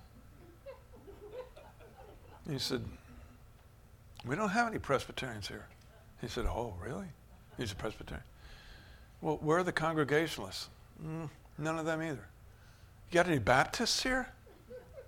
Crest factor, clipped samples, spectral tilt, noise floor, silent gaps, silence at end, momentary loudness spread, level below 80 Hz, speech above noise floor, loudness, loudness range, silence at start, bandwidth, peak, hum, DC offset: 26 dB; under 0.1%; -4.5 dB/octave; -59 dBFS; none; 0 s; 25 LU; -52 dBFS; 24 dB; -35 LUFS; 11 LU; 0 s; 19 kHz; -12 dBFS; none; under 0.1%